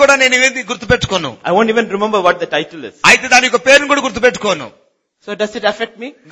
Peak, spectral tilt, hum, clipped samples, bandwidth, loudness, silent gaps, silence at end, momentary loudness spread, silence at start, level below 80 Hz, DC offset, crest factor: 0 dBFS; -2.5 dB/octave; none; 0.4%; 11 kHz; -12 LUFS; none; 0.2 s; 14 LU; 0 s; -44 dBFS; under 0.1%; 14 dB